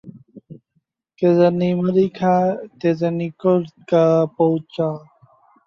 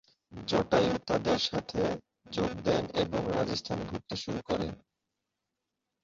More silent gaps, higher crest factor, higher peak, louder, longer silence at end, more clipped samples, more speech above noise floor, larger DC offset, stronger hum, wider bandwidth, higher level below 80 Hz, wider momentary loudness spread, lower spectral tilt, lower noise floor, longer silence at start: neither; about the same, 16 dB vs 20 dB; first, -4 dBFS vs -12 dBFS; first, -19 LUFS vs -31 LUFS; second, 0.7 s vs 1.25 s; neither; second, 51 dB vs 55 dB; neither; neither; second, 6.8 kHz vs 7.6 kHz; second, -64 dBFS vs -54 dBFS; second, 8 LU vs 12 LU; first, -9 dB/octave vs -5.5 dB/octave; second, -69 dBFS vs -86 dBFS; second, 0.05 s vs 0.3 s